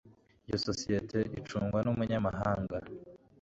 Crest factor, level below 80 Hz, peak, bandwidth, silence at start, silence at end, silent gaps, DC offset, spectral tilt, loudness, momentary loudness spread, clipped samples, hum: 18 dB; -54 dBFS; -16 dBFS; 8 kHz; 0.05 s; 0.25 s; none; under 0.1%; -6 dB/octave; -34 LUFS; 8 LU; under 0.1%; none